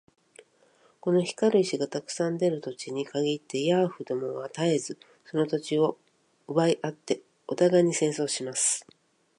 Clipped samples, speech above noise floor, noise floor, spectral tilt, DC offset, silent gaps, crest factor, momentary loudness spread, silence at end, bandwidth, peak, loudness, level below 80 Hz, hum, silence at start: under 0.1%; 36 dB; -63 dBFS; -4.5 dB/octave; under 0.1%; none; 18 dB; 10 LU; 0.55 s; 11.5 kHz; -10 dBFS; -27 LUFS; -80 dBFS; none; 1.05 s